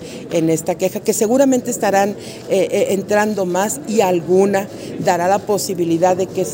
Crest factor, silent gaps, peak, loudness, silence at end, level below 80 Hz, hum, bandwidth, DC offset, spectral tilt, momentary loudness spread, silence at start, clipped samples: 16 dB; none; -2 dBFS; -17 LUFS; 0 s; -56 dBFS; none; 16.5 kHz; under 0.1%; -5 dB/octave; 6 LU; 0 s; under 0.1%